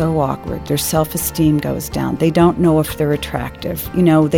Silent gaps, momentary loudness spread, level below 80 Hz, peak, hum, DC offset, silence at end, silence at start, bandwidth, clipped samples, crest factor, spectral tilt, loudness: none; 10 LU; -36 dBFS; -2 dBFS; none; under 0.1%; 0 s; 0 s; 18 kHz; under 0.1%; 14 dB; -6 dB/octave; -17 LUFS